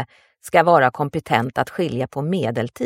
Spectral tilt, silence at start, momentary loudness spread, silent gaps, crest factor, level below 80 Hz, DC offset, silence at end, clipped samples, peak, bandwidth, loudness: -6.5 dB/octave; 0 s; 10 LU; none; 20 dB; -56 dBFS; under 0.1%; 0 s; under 0.1%; 0 dBFS; 16 kHz; -20 LUFS